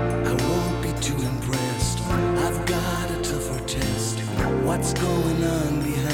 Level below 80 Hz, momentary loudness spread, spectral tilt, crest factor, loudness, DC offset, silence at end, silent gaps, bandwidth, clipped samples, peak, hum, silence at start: -34 dBFS; 3 LU; -5 dB/octave; 14 dB; -24 LUFS; under 0.1%; 0 s; none; 18 kHz; under 0.1%; -10 dBFS; none; 0 s